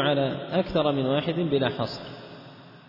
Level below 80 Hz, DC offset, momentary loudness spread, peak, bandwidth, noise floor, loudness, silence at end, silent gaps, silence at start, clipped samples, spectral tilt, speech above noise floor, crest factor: -54 dBFS; under 0.1%; 19 LU; -10 dBFS; 5.8 kHz; -47 dBFS; -26 LUFS; 0.1 s; none; 0 s; under 0.1%; -8 dB/octave; 21 dB; 16 dB